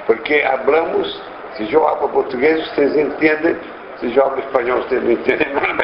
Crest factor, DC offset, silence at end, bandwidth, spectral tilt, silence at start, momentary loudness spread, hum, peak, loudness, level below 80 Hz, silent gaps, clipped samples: 16 dB; under 0.1%; 0 s; 5.6 kHz; -7.5 dB/octave; 0 s; 11 LU; none; 0 dBFS; -17 LUFS; -52 dBFS; none; under 0.1%